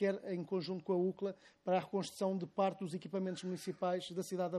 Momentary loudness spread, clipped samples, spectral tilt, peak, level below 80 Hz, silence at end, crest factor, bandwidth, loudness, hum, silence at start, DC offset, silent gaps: 7 LU; under 0.1%; -6 dB/octave; -22 dBFS; -84 dBFS; 0 s; 16 dB; 14 kHz; -39 LUFS; none; 0 s; under 0.1%; none